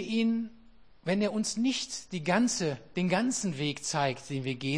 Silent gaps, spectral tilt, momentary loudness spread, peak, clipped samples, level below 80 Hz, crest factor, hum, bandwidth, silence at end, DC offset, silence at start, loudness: none; -4.5 dB/octave; 7 LU; -12 dBFS; under 0.1%; -64 dBFS; 20 dB; none; 10.5 kHz; 0 s; 0.2%; 0 s; -30 LUFS